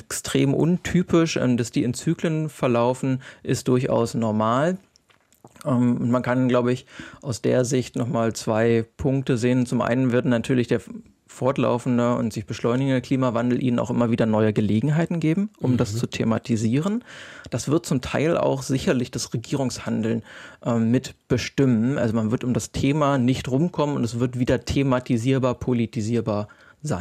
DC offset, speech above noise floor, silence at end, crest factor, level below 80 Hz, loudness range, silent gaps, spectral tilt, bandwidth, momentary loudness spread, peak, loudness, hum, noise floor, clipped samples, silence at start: under 0.1%; 37 dB; 0 s; 16 dB; -52 dBFS; 2 LU; none; -6.5 dB/octave; 14 kHz; 7 LU; -6 dBFS; -23 LUFS; none; -60 dBFS; under 0.1%; 0.1 s